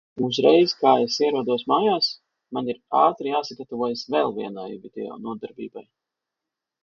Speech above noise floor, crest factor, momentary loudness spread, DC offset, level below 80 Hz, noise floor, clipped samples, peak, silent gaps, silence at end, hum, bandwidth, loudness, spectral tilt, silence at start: 63 dB; 20 dB; 17 LU; under 0.1%; -70 dBFS; -86 dBFS; under 0.1%; -2 dBFS; none; 1 s; none; 7.4 kHz; -22 LUFS; -5 dB/octave; 0.15 s